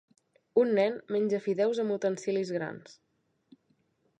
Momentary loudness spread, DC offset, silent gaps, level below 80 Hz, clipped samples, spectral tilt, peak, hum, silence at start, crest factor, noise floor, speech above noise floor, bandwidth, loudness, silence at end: 9 LU; under 0.1%; none; -82 dBFS; under 0.1%; -6 dB/octave; -12 dBFS; none; 0.55 s; 18 dB; -73 dBFS; 44 dB; 9.4 kHz; -29 LUFS; 1.25 s